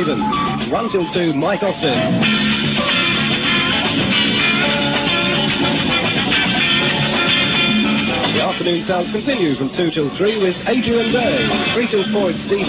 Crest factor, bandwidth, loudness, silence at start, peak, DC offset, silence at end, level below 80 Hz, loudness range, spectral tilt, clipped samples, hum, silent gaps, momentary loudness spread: 14 dB; 4 kHz; -16 LUFS; 0 s; -4 dBFS; under 0.1%; 0 s; -42 dBFS; 3 LU; -9 dB/octave; under 0.1%; none; none; 5 LU